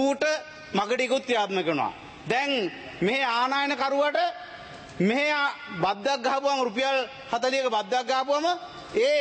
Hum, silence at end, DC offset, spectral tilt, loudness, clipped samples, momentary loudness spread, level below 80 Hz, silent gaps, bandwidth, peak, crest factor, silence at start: none; 0 s; under 0.1%; -4 dB/octave; -26 LUFS; under 0.1%; 8 LU; -66 dBFS; none; 8.8 kHz; -12 dBFS; 14 dB; 0 s